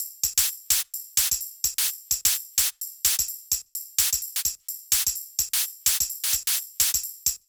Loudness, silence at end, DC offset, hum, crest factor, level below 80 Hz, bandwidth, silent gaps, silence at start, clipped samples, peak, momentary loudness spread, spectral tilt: -23 LUFS; 0.1 s; under 0.1%; none; 22 dB; -54 dBFS; over 20 kHz; none; 0 s; under 0.1%; -4 dBFS; 5 LU; 3 dB/octave